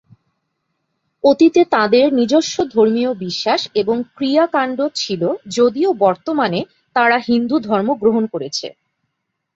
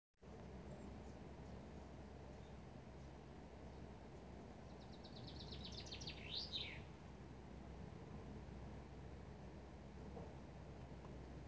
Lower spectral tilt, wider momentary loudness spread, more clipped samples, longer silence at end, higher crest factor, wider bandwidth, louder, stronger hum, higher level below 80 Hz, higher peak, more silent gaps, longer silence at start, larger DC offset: about the same, -4.5 dB/octave vs -5 dB/octave; about the same, 8 LU vs 9 LU; neither; first, 0.85 s vs 0 s; about the same, 16 dB vs 20 dB; about the same, 8 kHz vs 8 kHz; first, -16 LUFS vs -55 LUFS; neither; about the same, -60 dBFS vs -62 dBFS; first, -2 dBFS vs -34 dBFS; neither; first, 1.25 s vs 0.15 s; neither